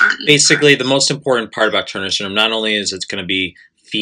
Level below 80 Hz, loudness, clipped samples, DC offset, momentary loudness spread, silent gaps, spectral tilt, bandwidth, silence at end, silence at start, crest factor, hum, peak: -62 dBFS; -14 LUFS; under 0.1%; under 0.1%; 10 LU; none; -2.5 dB/octave; 15.5 kHz; 0 s; 0 s; 16 dB; none; 0 dBFS